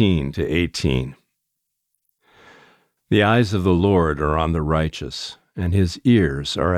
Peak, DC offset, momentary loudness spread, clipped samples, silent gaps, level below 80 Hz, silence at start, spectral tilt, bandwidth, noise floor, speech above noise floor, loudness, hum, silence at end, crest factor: -4 dBFS; under 0.1%; 11 LU; under 0.1%; none; -36 dBFS; 0 s; -6.5 dB/octave; 13 kHz; -77 dBFS; 59 dB; -20 LUFS; none; 0 s; 16 dB